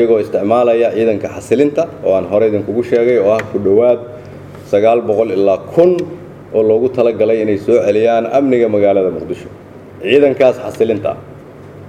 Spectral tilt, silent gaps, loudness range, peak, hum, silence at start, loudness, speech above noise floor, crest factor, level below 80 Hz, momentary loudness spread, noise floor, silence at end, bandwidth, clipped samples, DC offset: -7 dB/octave; none; 1 LU; 0 dBFS; none; 0 s; -13 LUFS; 21 dB; 14 dB; -52 dBFS; 13 LU; -34 dBFS; 0 s; 10 kHz; under 0.1%; under 0.1%